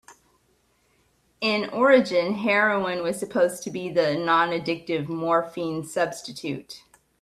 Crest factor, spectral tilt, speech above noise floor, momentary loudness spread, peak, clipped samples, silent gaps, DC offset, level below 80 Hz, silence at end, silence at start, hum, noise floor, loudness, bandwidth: 20 dB; -4.5 dB/octave; 42 dB; 14 LU; -4 dBFS; under 0.1%; none; under 0.1%; -66 dBFS; 0.45 s; 0.1 s; none; -66 dBFS; -24 LUFS; 14 kHz